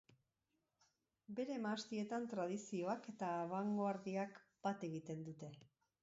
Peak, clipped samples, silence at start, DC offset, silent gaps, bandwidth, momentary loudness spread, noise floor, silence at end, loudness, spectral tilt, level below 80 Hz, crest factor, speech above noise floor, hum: -28 dBFS; under 0.1%; 1.3 s; under 0.1%; none; 7.6 kHz; 9 LU; -88 dBFS; 0.4 s; -45 LUFS; -5.5 dB/octave; -88 dBFS; 16 dB; 44 dB; none